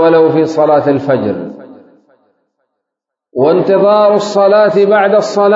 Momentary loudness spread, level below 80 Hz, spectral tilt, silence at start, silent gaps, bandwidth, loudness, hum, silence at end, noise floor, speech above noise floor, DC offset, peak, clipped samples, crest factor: 8 LU; -60 dBFS; -6.5 dB/octave; 0 s; none; 7.8 kHz; -10 LUFS; none; 0 s; -80 dBFS; 71 dB; under 0.1%; 0 dBFS; under 0.1%; 10 dB